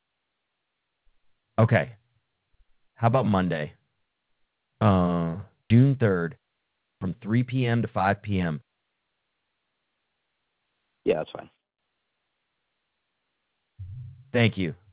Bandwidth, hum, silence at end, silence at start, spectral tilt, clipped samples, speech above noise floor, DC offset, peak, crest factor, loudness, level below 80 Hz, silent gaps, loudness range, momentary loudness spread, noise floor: 4 kHz; none; 0.2 s; 1.6 s; -11.5 dB/octave; under 0.1%; 57 dB; under 0.1%; -6 dBFS; 22 dB; -25 LUFS; -50 dBFS; none; 11 LU; 17 LU; -80 dBFS